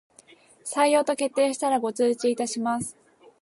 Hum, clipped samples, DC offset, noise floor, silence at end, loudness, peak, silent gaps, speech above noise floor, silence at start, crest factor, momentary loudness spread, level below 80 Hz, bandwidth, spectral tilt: none; under 0.1%; under 0.1%; -55 dBFS; 0.5 s; -24 LUFS; -10 dBFS; none; 31 dB; 0.65 s; 16 dB; 10 LU; -70 dBFS; 11.5 kHz; -3.5 dB/octave